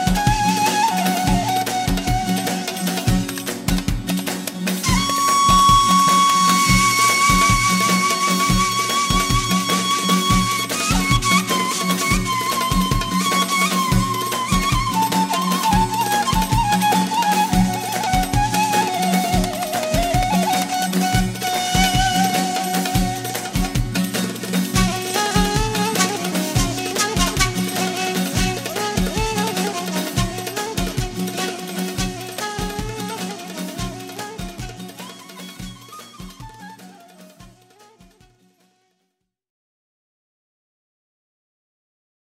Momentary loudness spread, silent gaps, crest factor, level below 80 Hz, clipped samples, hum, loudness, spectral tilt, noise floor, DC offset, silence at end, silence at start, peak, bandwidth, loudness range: 13 LU; none; 18 dB; -32 dBFS; under 0.1%; none; -18 LUFS; -3.5 dB/octave; -74 dBFS; under 0.1%; 4.8 s; 0 s; -2 dBFS; 16.5 kHz; 13 LU